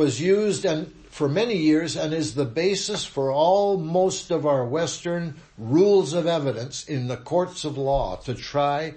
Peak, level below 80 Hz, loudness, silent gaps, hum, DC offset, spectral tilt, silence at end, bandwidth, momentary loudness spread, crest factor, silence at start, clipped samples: -8 dBFS; -48 dBFS; -23 LUFS; none; none; under 0.1%; -5 dB/octave; 0 s; 8.8 kHz; 10 LU; 16 dB; 0 s; under 0.1%